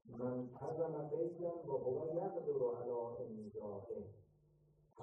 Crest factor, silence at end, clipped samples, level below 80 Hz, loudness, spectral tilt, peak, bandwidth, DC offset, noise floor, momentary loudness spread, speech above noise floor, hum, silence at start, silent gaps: 16 dB; 0 s; under 0.1%; -78 dBFS; -43 LUFS; -11 dB/octave; -28 dBFS; 6 kHz; under 0.1%; -72 dBFS; 9 LU; 29 dB; none; 0.05 s; none